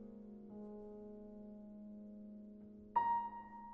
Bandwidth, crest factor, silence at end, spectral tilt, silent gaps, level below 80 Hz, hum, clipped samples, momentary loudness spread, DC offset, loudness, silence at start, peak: 4.8 kHz; 22 dB; 0 s; -6 dB/octave; none; -70 dBFS; none; under 0.1%; 17 LU; under 0.1%; -45 LUFS; 0 s; -24 dBFS